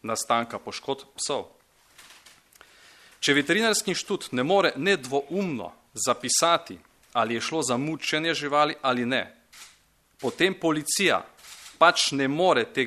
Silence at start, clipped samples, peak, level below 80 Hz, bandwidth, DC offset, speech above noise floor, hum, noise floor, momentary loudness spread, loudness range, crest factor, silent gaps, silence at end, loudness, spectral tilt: 0.05 s; under 0.1%; -4 dBFS; -68 dBFS; 13.5 kHz; under 0.1%; 36 dB; none; -61 dBFS; 13 LU; 3 LU; 22 dB; none; 0 s; -25 LUFS; -3 dB/octave